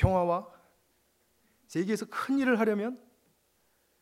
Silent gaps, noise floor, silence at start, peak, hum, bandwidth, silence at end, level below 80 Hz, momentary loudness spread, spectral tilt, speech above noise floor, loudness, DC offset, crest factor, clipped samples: none; -71 dBFS; 0 s; -10 dBFS; none; 16 kHz; 1.05 s; -46 dBFS; 11 LU; -7 dB/octave; 43 dB; -30 LUFS; under 0.1%; 20 dB; under 0.1%